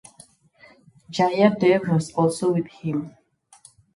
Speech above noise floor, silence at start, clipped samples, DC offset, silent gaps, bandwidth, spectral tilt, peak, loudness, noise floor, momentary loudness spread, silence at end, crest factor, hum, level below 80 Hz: 33 dB; 1.1 s; under 0.1%; under 0.1%; none; 11.5 kHz; -6.5 dB/octave; -2 dBFS; -22 LUFS; -54 dBFS; 12 LU; 0.85 s; 20 dB; none; -64 dBFS